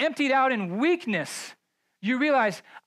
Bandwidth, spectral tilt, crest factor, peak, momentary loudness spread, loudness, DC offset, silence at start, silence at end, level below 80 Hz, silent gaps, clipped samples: 14.5 kHz; -4.5 dB/octave; 14 dB; -12 dBFS; 12 LU; -25 LUFS; under 0.1%; 0 s; 0.05 s; -86 dBFS; none; under 0.1%